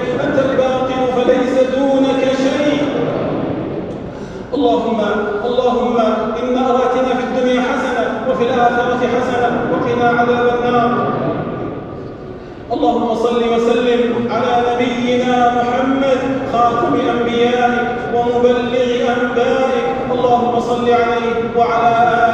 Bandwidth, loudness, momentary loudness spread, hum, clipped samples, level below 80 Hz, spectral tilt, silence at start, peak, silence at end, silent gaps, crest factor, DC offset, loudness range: 8.8 kHz; -15 LUFS; 6 LU; none; under 0.1%; -44 dBFS; -6 dB/octave; 0 s; -2 dBFS; 0 s; none; 14 dB; under 0.1%; 3 LU